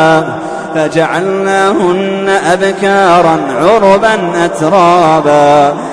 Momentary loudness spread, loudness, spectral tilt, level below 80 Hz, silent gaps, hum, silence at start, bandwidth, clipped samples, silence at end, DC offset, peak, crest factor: 6 LU; -9 LUFS; -5.5 dB/octave; -44 dBFS; none; none; 0 s; 11 kHz; 0.1%; 0 s; under 0.1%; 0 dBFS; 8 dB